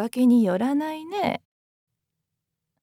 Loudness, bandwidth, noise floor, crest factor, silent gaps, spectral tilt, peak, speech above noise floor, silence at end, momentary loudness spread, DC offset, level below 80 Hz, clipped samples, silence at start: -23 LUFS; 14.5 kHz; -82 dBFS; 14 dB; none; -6.5 dB/octave; -12 dBFS; 60 dB; 1.45 s; 11 LU; under 0.1%; -70 dBFS; under 0.1%; 0 s